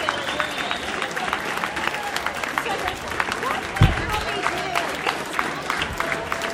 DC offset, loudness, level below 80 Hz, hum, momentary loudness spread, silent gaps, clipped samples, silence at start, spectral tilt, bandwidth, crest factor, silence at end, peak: under 0.1%; -24 LUFS; -38 dBFS; none; 5 LU; none; under 0.1%; 0 s; -4 dB/octave; 16.5 kHz; 22 dB; 0 s; -2 dBFS